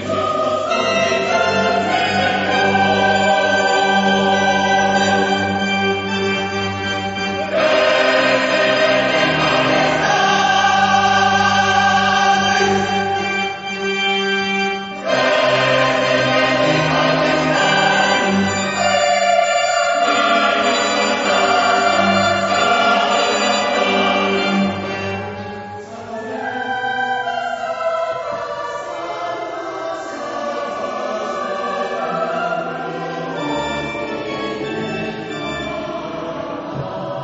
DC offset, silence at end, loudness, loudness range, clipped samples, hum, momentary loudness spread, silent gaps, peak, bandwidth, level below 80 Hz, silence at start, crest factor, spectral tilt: under 0.1%; 0 s; -17 LUFS; 9 LU; under 0.1%; none; 11 LU; none; -2 dBFS; 8 kHz; -52 dBFS; 0 s; 16 dB; -2 dB/octave